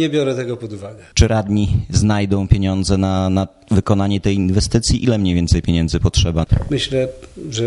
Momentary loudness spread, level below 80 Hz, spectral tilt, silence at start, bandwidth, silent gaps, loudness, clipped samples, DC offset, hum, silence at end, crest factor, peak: 7 LU; -26 dBFS; -6 dB/octave; 0 s; 11.5 kHz; none; -17 LUFS; under 0.1%; under 0.1%; none; 0 s; 16 dB; 0 dBFS